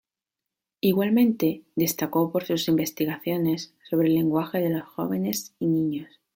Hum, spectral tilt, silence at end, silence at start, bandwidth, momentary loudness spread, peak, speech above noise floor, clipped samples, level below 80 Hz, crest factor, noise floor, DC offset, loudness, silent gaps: none; -5.5 dB/octave; 0.3 s; 0.85 s; 17 kHz; 8 LU; -8 dBFS; 63 dB; under 0.1%; -66 dBFS; 16 dB; -88 dBFS; under 0.1%; -25 LUFS; none